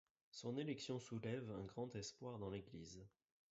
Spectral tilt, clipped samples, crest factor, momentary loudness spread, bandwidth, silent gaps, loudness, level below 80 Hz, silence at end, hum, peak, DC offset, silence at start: -6 dB/octave; under 0.1%; 18 dB; 12 LU; 7.6 kHz; none; -50 LUFS; -74 dBFS; 0.4 s; none; -34 dBFS; under 0.1%; 0.35 s